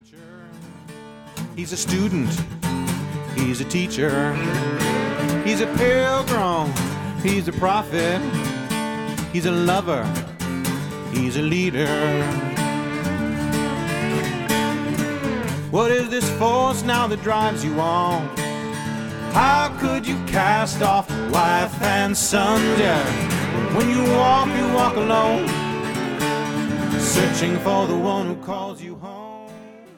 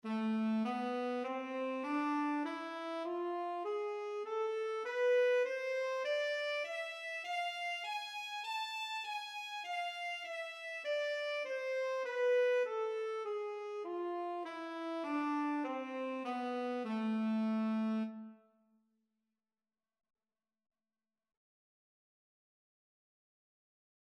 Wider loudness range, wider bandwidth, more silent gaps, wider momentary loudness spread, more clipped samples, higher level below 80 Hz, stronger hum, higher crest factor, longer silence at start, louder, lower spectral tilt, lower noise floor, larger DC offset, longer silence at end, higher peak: about the same, 4 LU vs 4 LU; first, 18 kHz vs 13 kHz; neither; about the same, 9 LU vs 8 LU; neither; first, -46 dBFS vs under -90 dBFS; neither; about the same, 18 dB vs 14 dB; about the same, 0.15 s vs 0.05 s; first, -21 LUFS vs -38 LUFS; about the same, -5 dB/octave vs -5 dB/octave; second, -43 dBFS vs under -90 dBFS; neither; second, 0.1 s vs 5.7 s; first, -4 dBFS vs -24 dBFS